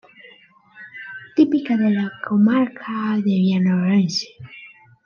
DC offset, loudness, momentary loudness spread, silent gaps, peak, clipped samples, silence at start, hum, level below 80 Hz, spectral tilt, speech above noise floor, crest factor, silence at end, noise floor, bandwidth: under 0.1%; -19 LUFS; 19 LU; none; -4 dBFS; under 0.1%; 0.25 s; none; -70 dBFS; -6.5 dB/octave; 32 dB; 16 dB; 0.4 s; -50 dBFS; 7 kHz